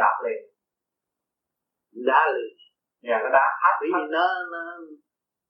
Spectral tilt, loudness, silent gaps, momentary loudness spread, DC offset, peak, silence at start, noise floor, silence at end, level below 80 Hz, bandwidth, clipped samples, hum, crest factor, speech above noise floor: -5.5 dB/octave; -23 LUFS; none; 17 LU; under 0.1%; -4 dBFS; 0 s; -86 dBFS; 0.55 s; under -90 dBFS; 5.8 kHz; under 0.1%; none; 22 dB; 63 dB